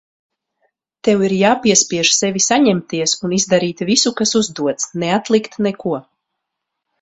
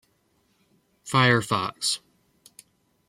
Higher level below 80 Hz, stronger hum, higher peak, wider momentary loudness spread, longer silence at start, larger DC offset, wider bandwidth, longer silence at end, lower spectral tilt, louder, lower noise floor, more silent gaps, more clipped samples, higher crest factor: first, -56 dBFS vs -66 dBFS; neither; first, 0 dBFS vs -6 dBFS; second, 8 LU vs 11 LU; about the same, 1.05 s vs 1.05 s; neither; second, 8.4 kHz vs 15.5 kHz; about the same, 1 s vs 1.1 s; about the same, -3 dB/octave vs -4 dB/octave; first, -15 LUFS vs -23 LUFS; first, -78 dBFS vs -68 dBFS; neither; neither; about the same, 18 dB vs 22 dB